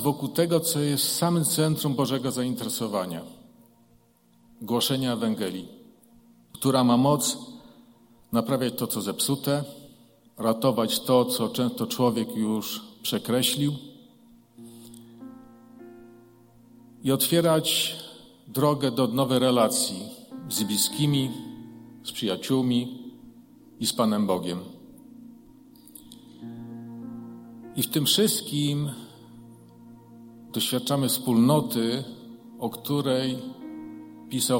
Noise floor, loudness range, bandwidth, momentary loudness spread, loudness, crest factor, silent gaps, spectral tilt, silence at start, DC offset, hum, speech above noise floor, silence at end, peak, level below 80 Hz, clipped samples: -61 dBFS; 6 LU; 17 kHz; 21 LU; -25 LUFS; 20 dB; none; -4.5 dB/octave; 0 s; under 0.1%; none; 36 dB; 0 s; -8 dBFS; -66 dBFS; under 0.1%